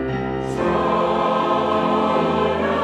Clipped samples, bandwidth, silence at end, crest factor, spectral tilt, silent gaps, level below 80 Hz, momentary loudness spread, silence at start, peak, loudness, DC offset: under 0.1%; 11.5 kHz; 0 s; 12 dB; -6.5 dB/octave; none; -44 dBFS; 5 LU; 0 s; -6 dBFS; -20 LUFS; under 0.1%